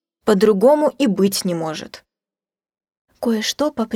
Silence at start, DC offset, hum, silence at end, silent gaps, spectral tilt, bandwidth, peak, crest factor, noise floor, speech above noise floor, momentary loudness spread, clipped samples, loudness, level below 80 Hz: 0.25 s; under 0.1%; none; 0 s; 2.97-3.08 s; -5 dB/octave; 17.5 kHz; -2 dBFS; 16 dB; under -90 dBFS; over 73 dB; 13 LU; under 0.1%; -18 LUFS; -60 dBFS